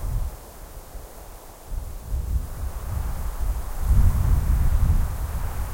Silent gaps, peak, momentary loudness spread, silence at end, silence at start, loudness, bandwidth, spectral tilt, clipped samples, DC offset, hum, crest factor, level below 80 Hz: none; -6 dBFS; 20 LU; 0 s; 0 s; -27 LUFS; 16.5 kHz; -6.5 dB/octave; under 0.1%; under 0.1%; none; 18 dB; -24 dBFS